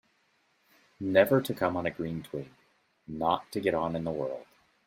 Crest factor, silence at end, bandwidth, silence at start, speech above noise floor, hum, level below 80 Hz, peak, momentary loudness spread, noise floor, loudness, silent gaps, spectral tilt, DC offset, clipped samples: 22 dB; 0.45 s; 16 kHz; 1 s; 42 dB; none; -64 dBFS; -8 dBFS; 16 LU; -71 dBFS; -30 LUFS; none; -6.5 dB/octave; under 0.1%; under 0.1%